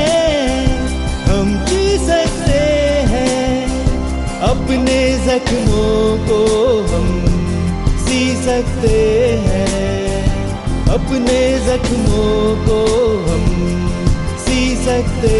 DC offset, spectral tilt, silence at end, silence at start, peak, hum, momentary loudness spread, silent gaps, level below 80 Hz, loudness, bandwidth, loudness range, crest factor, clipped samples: under 0.1%; -5.5 dB/octave; 0 s; 0 s; -2 dBFS; none; 4 LU; none; -20 dBFS; -15 LUFS; 11.5 kHz; 1 LU; 10 dB; under 0.1%